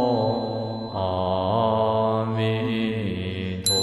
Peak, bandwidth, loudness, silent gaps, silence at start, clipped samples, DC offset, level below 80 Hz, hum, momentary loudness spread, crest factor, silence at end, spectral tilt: -6 dBFS; 13.5 kHz; -24 LUFS; none; 0 s; under 0.1%; under 0.1%; -54 dBFS; none; 7 LU; 16 dB; 0 s; -5 dB/octave